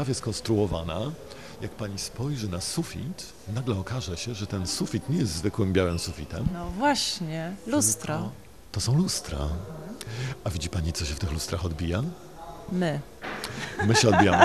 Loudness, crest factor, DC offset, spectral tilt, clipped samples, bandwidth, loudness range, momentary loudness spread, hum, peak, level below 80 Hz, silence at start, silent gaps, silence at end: -28 LUFS; 26 dB; 0.3%; -4.5 dB/octave; under 0.1%; 14.5 kHz; 5 LU; 13 LU; none; -2 dBFS; -44 dBFS; 0 s; none; 0 s